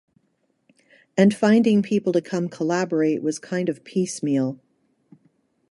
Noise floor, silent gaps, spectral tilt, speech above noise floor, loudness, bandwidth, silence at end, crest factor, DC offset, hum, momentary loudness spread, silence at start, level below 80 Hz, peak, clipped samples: -69 dBFS; none; -6 dB/octave; 49 dB; -22 LUFS; 11.5 kHz; 1.15 s; 18 dB; under 0.1%; none; 9 LU; 1.15 s; -70 dBFS; -4 dBFS; under 0.1%